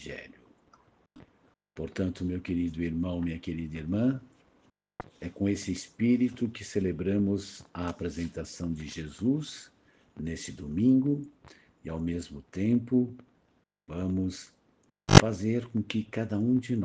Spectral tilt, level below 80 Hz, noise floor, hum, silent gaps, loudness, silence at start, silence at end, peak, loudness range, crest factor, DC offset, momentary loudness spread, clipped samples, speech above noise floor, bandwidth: -6 dB/octave; -54 dBFS; -71 dBFS; none; none; -29 LUFS; 0 s; 0 s; 0 dBFS; 7 LU; 30 dB; under 0.1%; 16 LU; under 0.1%; 40 dB; 9.6 kHz